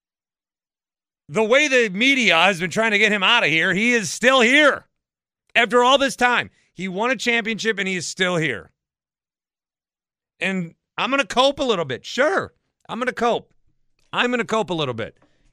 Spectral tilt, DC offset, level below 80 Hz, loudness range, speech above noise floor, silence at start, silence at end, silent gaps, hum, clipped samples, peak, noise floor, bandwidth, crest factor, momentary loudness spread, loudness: -3 dB/octave; under 0.1%; -60 dBFS; 9 LU; over 71 dB; 1.3 s; 0.45 s; none; none; under 0.1%; 0 dBFS; under -90 dBFS; 15.5 kHz; 20 dB; 13 LU; -18 LUFS